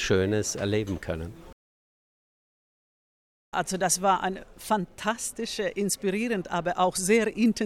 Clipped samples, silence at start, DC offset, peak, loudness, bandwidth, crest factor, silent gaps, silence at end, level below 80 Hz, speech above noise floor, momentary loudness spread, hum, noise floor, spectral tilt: under 0.1%; 0 s; under 0.1%; -10 dBFS; -27 LUFS; 16.5 kHz; 18 dB; 1.53-3.52 s; 0 s; -52 dBFS; over 63 dB; 10 LU; none; under -90 dBFS; -4 dB/octave